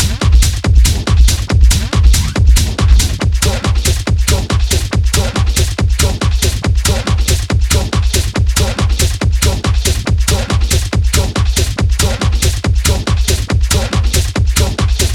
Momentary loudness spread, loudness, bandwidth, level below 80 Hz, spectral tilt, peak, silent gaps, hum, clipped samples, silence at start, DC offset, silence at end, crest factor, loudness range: 3 LU; -13 LUFS; 17 kHz; -14 dBFS; -4 dB/octave; 0 dBFS; none; none; under 0.1%; 0 s; under 0.1%; 0 s; 12 dB; 2 LU